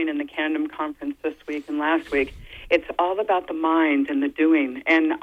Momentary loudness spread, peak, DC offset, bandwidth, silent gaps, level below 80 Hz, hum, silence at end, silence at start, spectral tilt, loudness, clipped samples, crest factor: 10 LU; -6 dBFS; under 0.1%; 6.4 kHz; none; -52 dBFS; 60 Hz at -65 dBFS; 0.05 s; 0 s; -5.5 dB/octave; -23 LUFS; under 0.1%; 18 dB